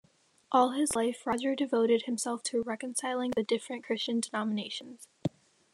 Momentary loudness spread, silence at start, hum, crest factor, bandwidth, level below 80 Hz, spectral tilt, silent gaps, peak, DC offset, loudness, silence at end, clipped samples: 12 LU; 0.5 s; none; 20 dB; 13 kHz; -72 dBFS; -3.5 dB/octave; none; -12 dBFS; under 0.1%; -31 LUFS; 0.45 s; under 0.1%